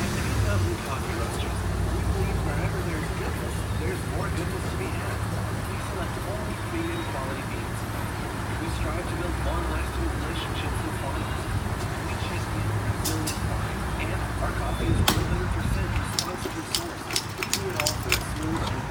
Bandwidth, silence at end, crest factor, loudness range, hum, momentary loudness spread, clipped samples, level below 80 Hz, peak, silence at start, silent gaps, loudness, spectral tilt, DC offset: 17.5 kHz; 0 s; 24 dB; 3 LU; none; 5 LU; under 0.1%; -34 dBFS; -2 dBFS; 0 s; none; -28 LUFS; -4.5 dB/octave; under 0.1%